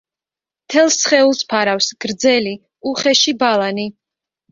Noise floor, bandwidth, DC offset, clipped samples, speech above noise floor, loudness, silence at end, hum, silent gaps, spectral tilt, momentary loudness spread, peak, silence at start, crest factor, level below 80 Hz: -89 dBFS; 7.6 kHz; under 0.1%; under 0.1%; 74 dB; -15 LUFS; 0.6 s; none; none; -2 dB/octave; 12 LU; -2 dBFS; 0.7 s; 16 dB; -62 dBFS